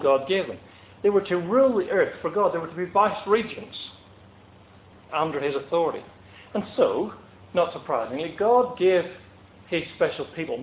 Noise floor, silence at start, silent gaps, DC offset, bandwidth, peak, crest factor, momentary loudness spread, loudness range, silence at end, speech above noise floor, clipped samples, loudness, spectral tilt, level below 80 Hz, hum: -51 dBFS; 0 s; none; under 0.1%; 4 kHz; -6 dBFS; 18 dB; 13 LU; 5 LU; 0 s; 27 dB; under 0.1%; -25 LUFS; -9.5 dB/octave; -60 dBFS; none